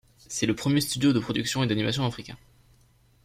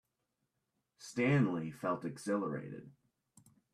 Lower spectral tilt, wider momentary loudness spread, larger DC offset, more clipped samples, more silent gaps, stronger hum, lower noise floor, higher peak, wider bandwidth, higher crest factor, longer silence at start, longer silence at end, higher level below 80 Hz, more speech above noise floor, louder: second, -4.5 dB/octave vs -7 dB/octave; second, 11 LU vs 19 LU; neither; neither; neither; neither; second, -61 dBFS vs -85 dBFS; first, -10 dBFS vs -20 dBFS; first, 16 kHz vs 13 kHz; about the same, 16 dB vs 18 dB; second, 0.3 s vs 1 s; about the same, 0.9 s vs 0.85 s; first, -56 dBFS vs -76 dBFS; second, 35 dB vs 50 dB; first, -26 LUFS vs -36 LUFS